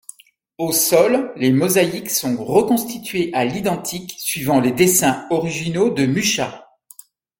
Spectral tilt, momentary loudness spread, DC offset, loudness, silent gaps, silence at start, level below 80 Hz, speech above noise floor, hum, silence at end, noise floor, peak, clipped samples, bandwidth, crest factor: -4 dB/octave; 9 LU; under 0.1%; -18 LUFS; none; 0.6 s; -56 dBFS; 28 dB; none; 0.8 s; -46 dBFS; -2 dBFS; under 0.1%; 17 kHz; 18 dB